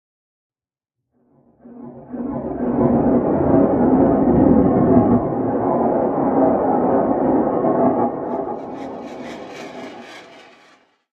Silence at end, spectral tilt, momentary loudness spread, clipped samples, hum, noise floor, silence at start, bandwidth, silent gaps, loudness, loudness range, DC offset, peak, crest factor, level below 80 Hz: 0.75 s; -10 dB/octave; 19 LU; under 0.1%; none; -85 dBFS; 1.65 s; 6.6 kHz; none; -17 LUFS; 8 LU; under 0.1%; 0 dBFS; 18 dB; -42 dBFS